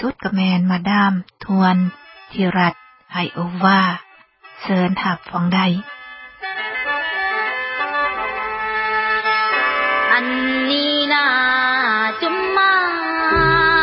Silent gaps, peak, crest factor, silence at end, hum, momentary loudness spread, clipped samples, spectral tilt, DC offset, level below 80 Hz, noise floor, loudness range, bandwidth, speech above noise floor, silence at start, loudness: none; -2 dBFS; 16 dB; 0 s; none; 10 LU; under 0.1%; -10 dB/octave; under 0.1%; -46 dBFS; -46 dBFS; 5 LU; 5.8 kHz; 28 dB; 0 s; -17 LUFS